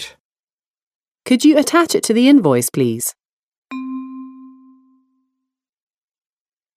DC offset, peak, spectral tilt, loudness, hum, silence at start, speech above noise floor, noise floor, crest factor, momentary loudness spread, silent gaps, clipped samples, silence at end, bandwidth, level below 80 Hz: under 0.1%; 0 dBFS; -4.5 dB/octave; -14 LUFS; none; 0 s; over 77 dB; under -90 dBFS; 18 dB; 22 LU; 0.20-0.32 s, 0.40-0.44 s, 0.53-0.58 s, 0.66-0.74 s, 0.82-1.00 s, 1.07-1.15 s, 3.25-3.52 s, 3.58-3.62 s; under 0.1%; 2.3 s; 16 kHz; -68 dBFS